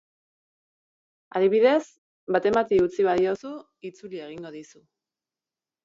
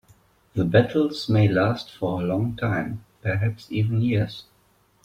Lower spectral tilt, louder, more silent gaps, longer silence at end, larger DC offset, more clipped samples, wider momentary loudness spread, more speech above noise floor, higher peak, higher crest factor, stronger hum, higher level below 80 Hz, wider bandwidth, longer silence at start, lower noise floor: second, -6 dB/octave vs -8 dB/octave; about the same, -23 LUFS vs -24 LUFS; first, 1.98-2.27 s vs none; first, 1.2 s vs 0.65 s; neither; neither; first, 21 LU vs 11 LU; first, over 66 dB vs 39 dB; second, -8 dBFS vs -4 dBFS; about the same, 18 dB vs 20 dB; neither; second, -62 dBFS vs -52 dBFS; second, 7.6 kHz vs 8.6 kHz; first, 1.35 s vs 0.55 s; first, under -90 dBFS vs -62 dBFS